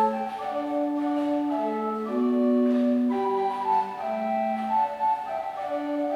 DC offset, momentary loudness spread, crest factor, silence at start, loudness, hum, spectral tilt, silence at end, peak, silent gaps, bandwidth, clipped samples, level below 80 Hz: under 0.1%; 8 LU; 12 dB; 0 s; -26 LUFS; none; -7 dB/octave; 0 s; -14 dBFS; none; 8.2 kHz; under 0.1%; -70 dBFS